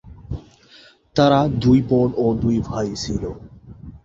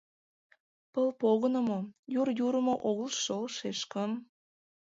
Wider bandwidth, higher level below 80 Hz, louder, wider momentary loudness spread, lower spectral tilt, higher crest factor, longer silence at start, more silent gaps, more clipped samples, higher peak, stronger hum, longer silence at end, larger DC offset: about the same, 7.8 kHz vs 7.8 kHz; first, -40 dBFS vs -78 dBFS; first, -19 LUFS vs -32 LUFS; first, 18 LU vs 8 LU; first, -7 dB/octave vs -4.5 dB/octave; about the same, 18 dB vs 18 dB; second, 0.05 s vs 0.95 s; second, none vs 1.99-2.03 s; neither; first, -2 dBFS vs -16 dBFS; neither; second, 0.1 s vs 0.65 s; neither